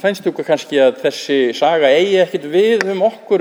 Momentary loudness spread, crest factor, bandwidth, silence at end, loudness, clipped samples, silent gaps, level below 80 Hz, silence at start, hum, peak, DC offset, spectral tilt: 6 LU; 14 dB; over 20 kHz; 0 s; -15 LUFS; under 0.1%; none; -72 dBFS; 0.05 s; none; 0 dBFS; under 0.1%; -4.5 dB/octave